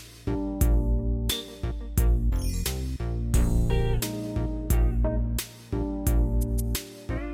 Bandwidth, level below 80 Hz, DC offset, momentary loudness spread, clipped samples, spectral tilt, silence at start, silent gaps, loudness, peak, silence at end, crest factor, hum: 16.5 kHz; -26 dBFS; under 0.1%; 8 LU; under 0.1%; -5.5 dB/octave; 0 s; none; -28 LUFS; -10 dBFS; 0 s; 14 dB; none